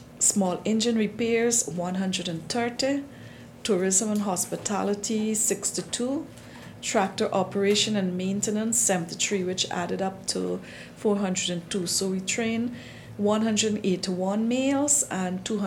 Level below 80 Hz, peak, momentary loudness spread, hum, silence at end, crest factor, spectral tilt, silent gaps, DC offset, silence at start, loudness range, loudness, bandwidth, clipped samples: -62 dBFS; -6 dBFS; 9 LU; none; 0 s; 20 dB; -3.5 dB/octave; none; under 0.1%; 0 s; 2 LU; -26 LUFS; 19 kHz; under 0.1%